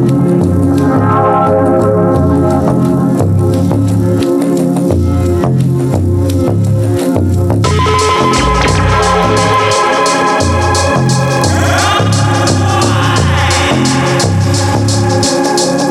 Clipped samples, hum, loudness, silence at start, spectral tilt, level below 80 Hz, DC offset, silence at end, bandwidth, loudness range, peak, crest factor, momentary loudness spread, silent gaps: under 0.1%; none; -10 LUFS; 0 s; -5.5 dB/octave; -30 dBFS; under 0.1%; 0 s; 14.5 kHz; 2 LU; 0 dBFS; 10 dB; 2 LU; none